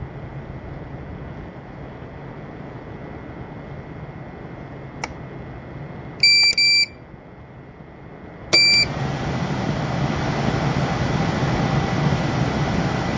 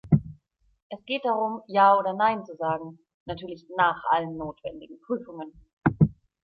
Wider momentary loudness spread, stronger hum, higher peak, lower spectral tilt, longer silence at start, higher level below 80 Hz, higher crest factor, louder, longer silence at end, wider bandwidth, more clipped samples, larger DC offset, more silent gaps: about the same, 23 LU vs 22 LU; neither; first, -2 dBFS vs -6 dBFS; second, -4 dB/octave vs -9.5 dB/octave; about the same, 0 s vs 0.05 s; first, -40 dBFS vs -54 dBFS; about the same, 20 dB vs 20 dB; first, -18 LUFS vs -25 LUFS; second, 0 s vs 0.3 s; first, 7.6 kHz vs 5.6 kHz; neither; neither; second, none vs 0.82-0.90 s, 3.14-3.26 s, 5.73-5.77 s